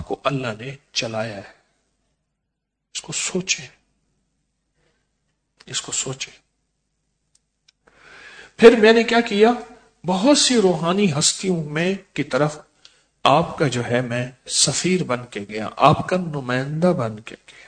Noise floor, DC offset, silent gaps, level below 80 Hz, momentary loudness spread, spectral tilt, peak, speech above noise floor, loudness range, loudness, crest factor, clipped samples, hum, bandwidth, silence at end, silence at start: -78 dBFS; under 0.1%; none; -56 dBFS; 15 LU; -4 dB/octave; 0 dBFS; 59 dB; 15 LU; -19 LUFS; 22 dB; under 0.1%; none; 9.6 kHz; 0.15 s; 0 s